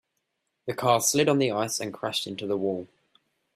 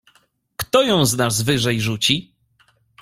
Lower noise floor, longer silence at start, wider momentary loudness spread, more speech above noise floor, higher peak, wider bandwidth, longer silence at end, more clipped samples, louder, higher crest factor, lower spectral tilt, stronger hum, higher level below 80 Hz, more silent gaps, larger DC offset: first, -79 dBFS vs -60 dBFS; about the same, 0.65 s vs 0.6 s; first, 12 LU vs 7 LU; first, 53 dB vs 42 dB; second, -8 dBFS vs -2 dBFS; about the same, 15.5 kHz vs 16.5 kHz; about the same, 0.7 s vs 0.8 s; neither; second, -26 LUFS vs -18 LUFS; about the same, 20 dB vs 18 dB; about the same, -3.5 dB/octave vs -4 dB/octave; neither; second, -68 dBFS vs -50 dBFS; neither; neither